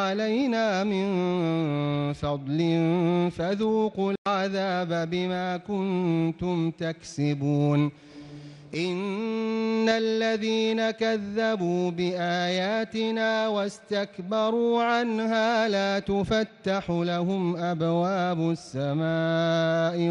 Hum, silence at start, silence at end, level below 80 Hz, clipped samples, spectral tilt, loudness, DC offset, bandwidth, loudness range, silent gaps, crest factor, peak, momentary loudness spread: none; 0 s; 0 s; -58 dBFS; under 0.1%; -6.5 dB/octave; -26 LUFS; under 0.1%; 10 kHz; 2 LU; 4.18-4.25 s; 14 dB; -12 dBFS; 6 LU